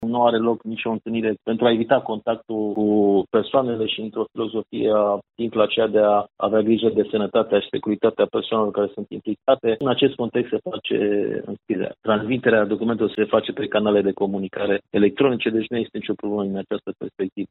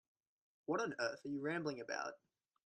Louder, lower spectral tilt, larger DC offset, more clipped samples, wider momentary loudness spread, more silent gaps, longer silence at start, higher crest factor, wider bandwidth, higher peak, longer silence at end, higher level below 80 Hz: first, -22 LUFS vs -42 LUFS; about the same, -4 dB/octave vs -4.5 dB/octave; neither; neither; about the same, 8 LU vs 6 LU; first, 17.32-17.36 s vs none; second, 0 s vs 0.7 s; about the same, 20 dB vs 20 dB; second, 4.1 kHz vs 9.4 kHz; first, -2 dBFS vs -26 dBFS; second, 0.05 s vs 0.5 s; first, -62 dBFS vs -86 dBFS